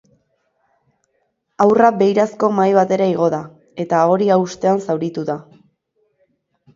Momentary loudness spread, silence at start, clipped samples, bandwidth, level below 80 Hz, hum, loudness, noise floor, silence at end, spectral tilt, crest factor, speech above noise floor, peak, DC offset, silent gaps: 13 LU; 1.6 s; under 0.1%; 7.6 kHz; -64 dBFS; none; -16 LUFS; -68 dBFS; 1.35 s; -7 dB/octave; 18 dB; 53 dB; 0 dBFS; under 0.1%; none